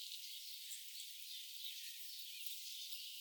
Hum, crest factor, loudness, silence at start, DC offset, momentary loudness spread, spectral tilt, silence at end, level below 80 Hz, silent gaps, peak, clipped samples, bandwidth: none; 22 dB; -47 LUFS; 0 s; under 0.1%; 3 LU; 9 dB/octave; 0 s; under -90 dBFS; none; -28 dBFS; under 0.1%; over 20 kHz